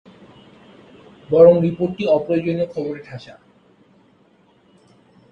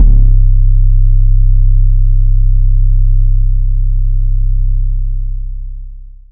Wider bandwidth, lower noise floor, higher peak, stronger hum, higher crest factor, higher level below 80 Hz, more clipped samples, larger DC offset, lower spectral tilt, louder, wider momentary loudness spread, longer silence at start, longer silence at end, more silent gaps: first, 5.6 kHz vs 0.5 kHz; first, -56 dBFS vs -28 dBFS; about the same, 0 dBFS vs 0 dBFS; neither; first, 20 dB vs 8 dB; second, -58 dBFS vs -8 dBFS; second, under 0.1% vs 1%; second, under 0.1% vs 4%; second, -9 dB/octave vs -14 dB/octave; second, -17 LUFS vs -14 LUFS; first, 21 LU vs 12 LU; first, 1.3 s vs 0 s; first, 2 s vs 0.25 s; neither